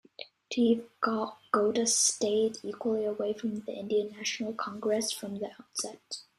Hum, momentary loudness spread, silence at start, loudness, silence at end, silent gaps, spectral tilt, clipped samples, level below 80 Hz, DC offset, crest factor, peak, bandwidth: none; 12 LU; 0.2 s; -30 LUFS; 0.15 s; none; -2.5 dB/octave; under 0.1%; -74 dBFS; under 0.1%; 18 dB; -12 dBFS; 14.5 kHz